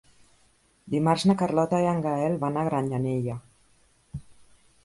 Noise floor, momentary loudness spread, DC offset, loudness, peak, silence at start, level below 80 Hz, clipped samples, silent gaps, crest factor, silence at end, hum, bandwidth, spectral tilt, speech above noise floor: -63 dBFS; 20 LU; under 0.1%; -26 LUFS; -8 dBFS; 0.85 s; -58 dBFS; under 0.1%; none; 20 dB; 0.5 s; none; 11.5 kHz; -7 dB/octave; 39 dB